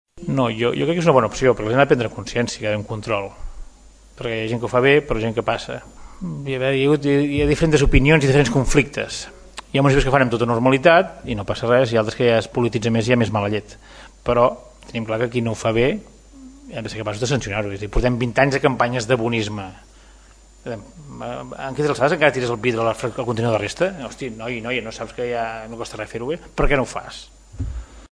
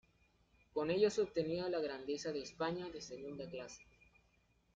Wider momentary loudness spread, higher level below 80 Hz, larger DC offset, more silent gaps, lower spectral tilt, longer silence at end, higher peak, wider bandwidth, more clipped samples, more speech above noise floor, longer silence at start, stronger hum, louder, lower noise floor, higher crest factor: about the same, 15 LU vs 14 LU; first, -34 dBFS vs -72 dBFS; neither; neither; about the same, -6 dB/octave vs -5 dB/octave; second, 0.05 s vs 0.9 s; first, 0 dBFS vs -20 dBFS; first, 11 kHz vs 7.8 kHz; neither; second, 28 dB vs 35 dB; second, 0.15 s vs 0.75 s; neither; first, -20 LUFS vs -40 LUFS; second, -47 dBFS vs -75 dBFS; about the same, 20 dB vs 20 dB